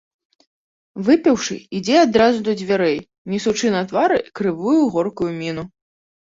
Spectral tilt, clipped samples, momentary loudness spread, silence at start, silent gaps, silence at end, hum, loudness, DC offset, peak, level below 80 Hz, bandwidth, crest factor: -5 dB/octave; under 0.1%; 12 LU; 0.95 s; 3.18-3.25 s; 0.55 s; none; -18 LUFS; under 0.1%; -2 dBFS; -56 dBFS; 7.8 kHz; 18 dB